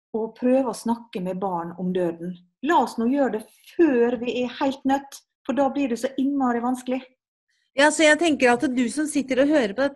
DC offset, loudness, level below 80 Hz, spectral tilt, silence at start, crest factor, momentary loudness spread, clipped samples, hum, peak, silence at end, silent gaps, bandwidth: under 0.1%; -23 LUFS; -64 dBFS; -4.5 dB/octave; 0.15 s; 18 dB; 12 LU; under 0.1%; none; -4 dBFS; 0 s; 5.35-5.45 s, 7.28-7.47 s; 12.5 kHz